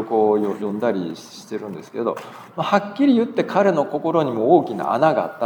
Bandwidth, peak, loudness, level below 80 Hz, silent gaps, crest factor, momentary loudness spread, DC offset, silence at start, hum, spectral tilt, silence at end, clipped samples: 19.5 kHz; -2 dBFS; -20 LUFS; -76 dBFS; none; 18 dB; 14 LU; under 0.1%; 0 s; none; -7 dB/octave; 0 s; under 0.1%